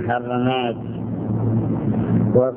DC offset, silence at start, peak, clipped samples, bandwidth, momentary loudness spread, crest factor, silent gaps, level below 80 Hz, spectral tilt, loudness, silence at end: under 0.1%; 0 s; -2 dBFS; under 0.1%; 3.5 kHz; 9 LU; 18 dB; none; -44 dBFS; -12 dB/octave; -21 LUFS; 0 s